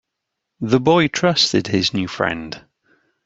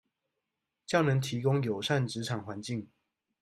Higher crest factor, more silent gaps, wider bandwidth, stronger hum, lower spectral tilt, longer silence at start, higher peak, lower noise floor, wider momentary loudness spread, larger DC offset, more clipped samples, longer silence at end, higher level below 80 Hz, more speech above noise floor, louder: about the same, 18 dB vs 20 dB; neither; second, 8 kHz vs 12.5 kHz; neither; about the same, -4.5 dB/octave vs -5.5 dB/octave; second, 0.6 s vs 0.9 s; first, -2 dBFS vs -12 dBFS; second, -79 dBFS vs -86 dBFS; first, 14 LU vs 11 LU; neither; neither; first, 0.7 s vs 0.55 s; first, -54 dBFS vs -70 dBFS; first, 61 dB vs 56 dB; first, -17 LUFS vs -31 LUFS